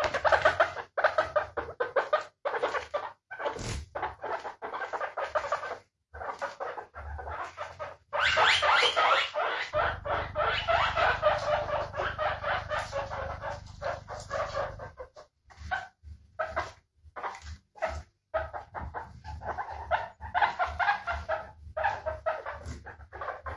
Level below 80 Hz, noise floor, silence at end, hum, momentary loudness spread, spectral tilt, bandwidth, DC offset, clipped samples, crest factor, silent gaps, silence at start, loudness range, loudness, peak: -50 dBFS; -55 dBFS; 0 s; none; 17 LU; -3 dB/octave; 11.5 kHz; under 0.1%; under 0.1%; 22 dB; none; 0 s; 12 LU; -30 LUFS; -10 dBFS